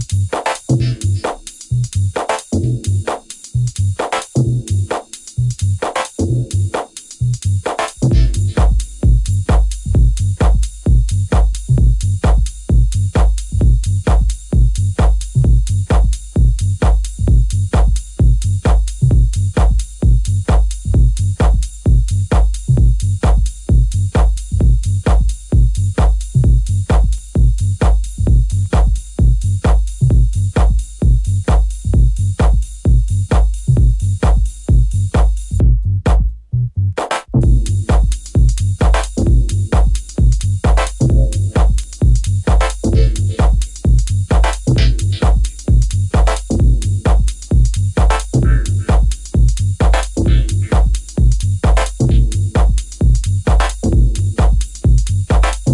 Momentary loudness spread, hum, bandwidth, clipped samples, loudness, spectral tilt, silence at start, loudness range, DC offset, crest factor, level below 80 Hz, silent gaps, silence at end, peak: 4 LU; none; 11.5 kHz; under 0.1%; -16 LUFS; -6.5 dB/octave; 0 s; 3 LU; under 0.1%; 12 dB; -14 dBFS; none; 0 s; 0 dBFS